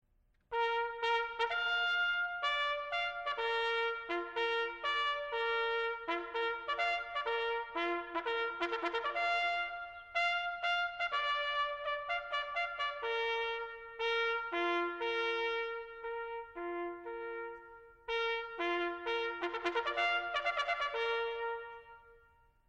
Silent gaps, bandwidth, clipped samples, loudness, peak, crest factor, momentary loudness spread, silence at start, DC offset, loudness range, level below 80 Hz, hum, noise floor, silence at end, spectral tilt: none; 8.6 kHz; under 0.1%; -35 LUFS; -20 dBFS; 16 dB; 9 LU; 0.5 s; under 0.1%; 4 LU; -66 dBFS; none; -70 dBFS; 0.55 s; -2.5 dB/octave